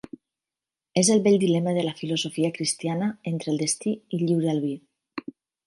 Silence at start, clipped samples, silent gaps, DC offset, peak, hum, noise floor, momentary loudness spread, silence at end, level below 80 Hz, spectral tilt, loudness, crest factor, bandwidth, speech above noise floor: 0.95 s; under 0.1%; none; under 0.1%; -8 dBFS; none; under -90 dBFS; 19 LU; 0.45 s; -70 dBFS; -5 dB/octave; -24 LUFS; 18 dB; 11.5 kHz; over 66 dB